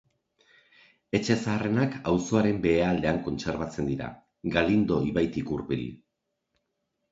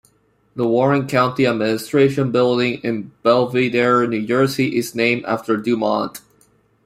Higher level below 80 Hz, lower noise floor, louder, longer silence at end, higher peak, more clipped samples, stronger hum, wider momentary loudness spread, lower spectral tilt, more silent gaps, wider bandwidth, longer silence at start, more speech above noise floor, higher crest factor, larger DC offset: first, -50 dBFS vs -58 dBFS; first, -81 dBFS vs -59 dBFS; second, -27 LUFS vs -18 LUFS; first, 1.15 s vs 0.7 s; second, -6 dBFS vs -2 dBFS; neither; neither; first, 9 LU vs 5 LU; about the same, -6.5 dB/octave vs -6 dB/octave; neither; second, 8 kHz vs 15.5 kHz; first, 1.15 s vs 0.55 s; first, 54 dB vs 42 dB; first, 22 dB vs 16 dB; neither